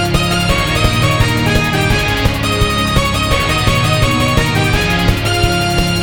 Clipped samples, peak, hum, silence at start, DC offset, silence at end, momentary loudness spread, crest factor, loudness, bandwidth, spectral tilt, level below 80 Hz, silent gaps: under 0.1%; 0 dBFS; none; 0 s; 0.6%; 0 s; 1 LU; 14 dB; -13 LUFS; 19 kHz; -4.5 dB/octave; -22 dBFS; none